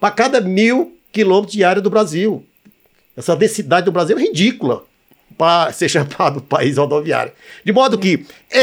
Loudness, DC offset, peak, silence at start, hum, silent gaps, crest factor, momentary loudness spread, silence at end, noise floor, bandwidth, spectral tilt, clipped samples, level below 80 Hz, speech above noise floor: -15 LUFS; under 0.1%; -2 dBFS; 0 s; none; none; 14 dB; 8 LU; 0 s; -52 dBFS; 16 kHz; -5 dB/octave; under 0.1%; -64 dBFS; 37 dB